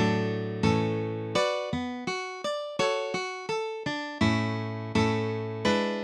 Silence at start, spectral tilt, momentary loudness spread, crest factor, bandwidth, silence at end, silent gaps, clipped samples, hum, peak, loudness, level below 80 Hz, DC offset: 0 s; -5.5 dB/octave; 6 LU; 18 dB; 11 kHz; 0 s; none; under 0.1%; none; -10 dBFS; -29 LUFS; -56 dBFS; under 0.1%